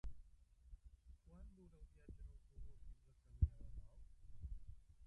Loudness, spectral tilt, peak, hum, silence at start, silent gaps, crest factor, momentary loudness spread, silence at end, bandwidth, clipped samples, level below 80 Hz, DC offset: -51 LUFS; -9 dB/octave; -24 dBFS; none; 0.05 s; none; 26 dB; 24 LU; 0 s; 3 kHz; under 0.1%; -52 dBFS; under 0.1%